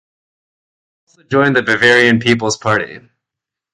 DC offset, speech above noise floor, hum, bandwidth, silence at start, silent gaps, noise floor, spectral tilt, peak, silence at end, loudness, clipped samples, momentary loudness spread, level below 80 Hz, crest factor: under 0.1%; 70 dB; none; 11.5 kHz; 1.3 s; none; -84 dBFS; -4.5 dB/octave; 0 dBFS; 0.75 s; -12 LUFS; under 0.1%; 9 LU; -54 dBFS; 16 dB